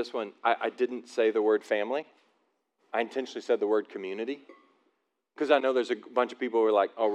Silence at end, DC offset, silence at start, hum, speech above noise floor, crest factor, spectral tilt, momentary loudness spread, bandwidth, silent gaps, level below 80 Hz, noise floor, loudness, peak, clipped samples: 0 s; under 0.1%; 0 s; none; 48 dB; 20 dB; -4 dB/octave; 10 LU; 9.4 kHz; none; under -90 dBFS; -76 dBFS; -29 LUFS; -10 dBFS; under 0.1%